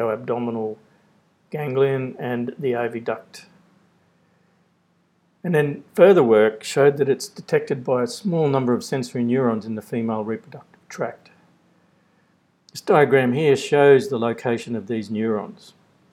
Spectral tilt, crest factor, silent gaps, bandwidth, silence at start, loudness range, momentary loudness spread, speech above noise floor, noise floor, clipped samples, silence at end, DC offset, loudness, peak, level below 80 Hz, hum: -6.5 dB/octave; 22 dB; none; 14 kHz; 0 s; 10 LU; 15 LU; 44 dB; -64 dBFS; under 0.1%; 0.6 s; under 0.1%; -21 LUFS; 0 dBFS; -76 dBFS; none